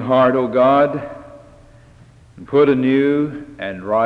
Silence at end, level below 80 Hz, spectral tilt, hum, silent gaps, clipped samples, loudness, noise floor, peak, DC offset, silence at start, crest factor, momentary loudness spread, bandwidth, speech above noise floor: 0 s; -52 dBFS; -8.5 dB/octave; none; none; under 0.1%; -16 LUFS; -46 dBFS; -4 dBFS; under 0.1%; 0 s; 14 dB; 15 LU; 5.6 kHz; 30 dB